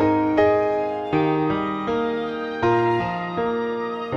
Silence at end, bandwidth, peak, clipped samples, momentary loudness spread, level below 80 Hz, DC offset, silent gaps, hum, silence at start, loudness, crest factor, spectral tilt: 0 s; 7 kHz; -6 dBFS; under 0.1%; 7 LU; -50 dBFS; under 0.1%; none; none; 0 s; -22 LUFS; 14 dB; -8 dB/octave